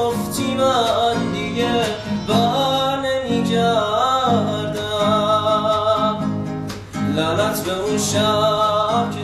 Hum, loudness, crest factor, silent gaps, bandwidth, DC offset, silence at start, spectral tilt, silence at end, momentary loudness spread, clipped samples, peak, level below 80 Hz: none; -19 LUFS; 14 dB; none; 15.5 kHz; under 0.1%; 0 s; -4.5 dB/octave; 0 s; 6 LU; under 0.1%; -6 dBFS; -46 dBFS